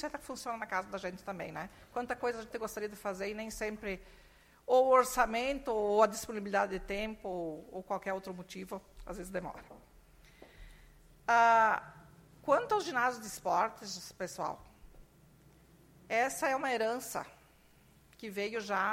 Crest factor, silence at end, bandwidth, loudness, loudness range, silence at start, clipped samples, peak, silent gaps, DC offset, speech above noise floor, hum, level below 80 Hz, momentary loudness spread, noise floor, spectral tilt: 22 dB; 0 s; 16.5 kHz; -34 LUFS; 10 LU; 0 s; under 0.1%; -12 dBFS; none; under 0.1%; 30 dB; none; -60 dBFS; 18 LU; -63 dBFS; -3.5 dB/octave